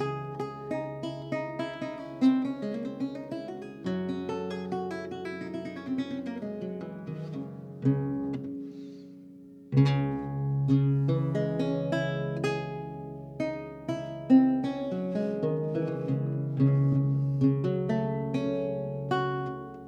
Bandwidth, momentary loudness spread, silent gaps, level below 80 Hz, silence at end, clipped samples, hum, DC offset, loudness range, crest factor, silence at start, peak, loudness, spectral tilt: 8 kHz; 13 LU; none; -62 dBFS; 0 s; under 0.1%; none; under 0.1%; 7 LU; 18 dB; 0 s; -10 dBFS; -30 LUFS; -9 dB/octave